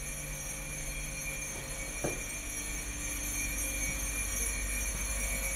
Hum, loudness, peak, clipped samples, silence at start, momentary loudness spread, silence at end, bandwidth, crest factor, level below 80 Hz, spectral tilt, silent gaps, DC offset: none; -35 LUFS; -20 dBFS; under 0.1%; 0 s; 5 LU; 0 s; 16 kHz; 16 dB; -40 dBFS; -2 dB/octave; none; under 0.1%